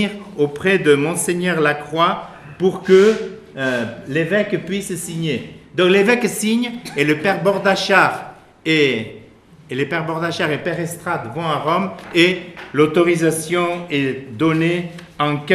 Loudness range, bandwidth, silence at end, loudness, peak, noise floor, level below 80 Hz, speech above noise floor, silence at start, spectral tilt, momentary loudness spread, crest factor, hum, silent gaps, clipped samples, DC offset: 4 LU; 14.5 kHz; 0 s; -18 LUFS; 0 dBFS; -45 dBFS; -56 dBFS; 27 dB; 0 s; -5 dB/octave; 11 LU; 18 dB; none; none; under 0.1%; under 0.1%